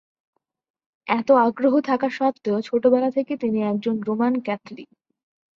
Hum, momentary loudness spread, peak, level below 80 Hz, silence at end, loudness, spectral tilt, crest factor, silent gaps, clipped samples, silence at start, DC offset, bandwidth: none; 12 LU; -6 dBFS; -68 dBFS; 0.75 s; -21 LUFS; -7.5 dB/octave; 18 dB; none; under 0.1%; 1.05 s; under 0.1%; 7 kHz